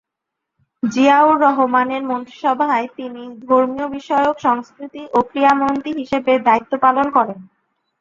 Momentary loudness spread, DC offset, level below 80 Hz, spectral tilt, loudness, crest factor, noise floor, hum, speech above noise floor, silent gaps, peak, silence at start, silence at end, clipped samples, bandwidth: 13 LU; under 0.1%; -58 dBFS; -5.5 dB/octave; -16 LUFS; 16 dB; -81 dBFS; none; 64 dB; none; -2 dBFS; 0.85 s; 0.6 s; under 0.1%; 7.4 kHz